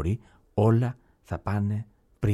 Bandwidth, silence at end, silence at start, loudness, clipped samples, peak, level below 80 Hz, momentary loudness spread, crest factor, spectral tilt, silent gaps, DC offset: 10.5 kHz; 0 s; 0 s; -28 LUFS; under 0.1%; -10 dBFS; -46 dBFS; 16 LU; 16 dB; -9.5 dB/octave; none; under 0.1%